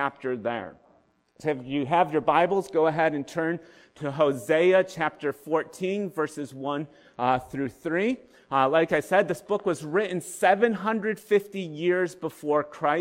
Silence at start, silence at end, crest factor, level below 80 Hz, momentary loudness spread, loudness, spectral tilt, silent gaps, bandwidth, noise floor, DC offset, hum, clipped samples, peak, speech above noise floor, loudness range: 0 s; 0 s; 18 dB; -66 dBFS; 11 LU; -26 LUFS; -5.5 dB/octave; none; 16 kHz; -63 dBFS; under 0.1%; none; under 0.1%; -8 dBFS; 37 dB; 3 LU